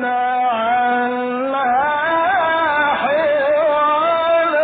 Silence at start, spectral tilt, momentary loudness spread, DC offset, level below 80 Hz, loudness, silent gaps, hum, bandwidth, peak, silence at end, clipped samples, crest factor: 0 s; -8.5 dB/octave; 3 LU; under 0.1%; -56 dBFS; -16 LUFS; none; none; 4.7 kHz; -6 dBFS; 0 s; under 0.1%; 10 dB